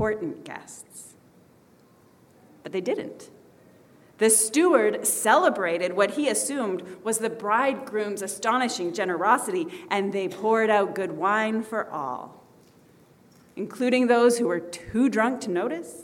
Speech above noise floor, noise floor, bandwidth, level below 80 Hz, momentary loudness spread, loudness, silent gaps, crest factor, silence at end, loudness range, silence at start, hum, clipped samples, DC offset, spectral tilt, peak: 32 dB; -57 dBFS; 18 kHz; -64 dBFS; 17 LU; -24 LUFS; none; 20 dB; 0 s; 10 LU; 0 s; none; under 0.1%; under 0.1%; -3 dB/octave; -6 dBFS